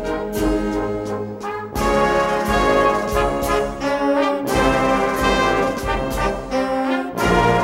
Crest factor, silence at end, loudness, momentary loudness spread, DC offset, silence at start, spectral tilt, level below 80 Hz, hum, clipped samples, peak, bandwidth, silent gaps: 14 dB; 0 s; -19 LUFS; 7 LU; under 0.1%; 0 s; -5 dB/octave; -32 dBFS; none; under 0.1%; -4 dBFS; 16 kHz; none